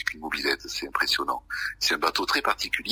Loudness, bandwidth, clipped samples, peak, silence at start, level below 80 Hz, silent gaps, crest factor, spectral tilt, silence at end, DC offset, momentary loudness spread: -26 LUFS; 16 kHz; under 0.1%; -8 dBFS; 0 s; -54 dBFS; none; 18 dB; -1 dB/octave; 0 s; under 0.1%; 6 LU